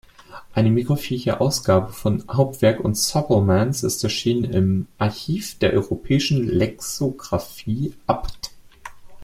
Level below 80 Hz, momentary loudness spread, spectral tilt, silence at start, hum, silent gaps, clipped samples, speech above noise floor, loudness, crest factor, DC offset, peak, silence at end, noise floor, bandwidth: -44 dBFS; 9 LU; -5.5 dB/octave; 0.3 s; none; none; under 0.1%; 21 dB; -21 LUFS; 18 dB; under 0.1%; -2 dBFS; 0 s; -42 dBFS; 16.5 kHz